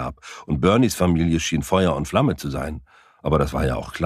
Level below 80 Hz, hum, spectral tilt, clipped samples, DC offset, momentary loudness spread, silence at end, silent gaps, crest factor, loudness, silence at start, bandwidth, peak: -36 dBFS; none; -6 dB/octave; under 0.1%; under 0.1%; 14 LU; 0 s; none; 18 dB; -21 LUFS; 0 s; 15.5 kHz; -2 dBFS